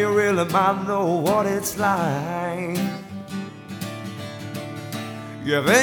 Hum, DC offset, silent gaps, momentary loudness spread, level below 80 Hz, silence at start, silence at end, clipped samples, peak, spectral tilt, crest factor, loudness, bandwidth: none; under 0.1%; none; 14 LU; -58 dBFS; 0 s; 0 s; under 0.1%; -2 dBFS; -4.5 dB/octave; 22 dB; -24 LUFS; over 20 kHz